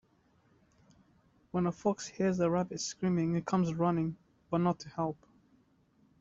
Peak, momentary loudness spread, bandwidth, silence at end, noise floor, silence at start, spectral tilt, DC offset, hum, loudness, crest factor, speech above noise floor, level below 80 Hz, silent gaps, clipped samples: -16 dBFS; 7 LU; 7.8 kHz; 1.05 s; -69 dBFS; 1.55 s; -6.5 dB/octave; under 0.1%; none; -33 LUFS; 18 dB; 37 dB; -66 dBFS; none; under 0.1%